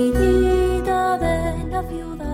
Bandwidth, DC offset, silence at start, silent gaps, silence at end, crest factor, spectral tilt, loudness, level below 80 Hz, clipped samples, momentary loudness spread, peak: 16 kHz; under 0.1%; 0 s; none; 0 s; 12 dB; -7 dB/octave; -20 LUFS; -28 dBFS; under 0.1%; 10 LU; -6 dBFS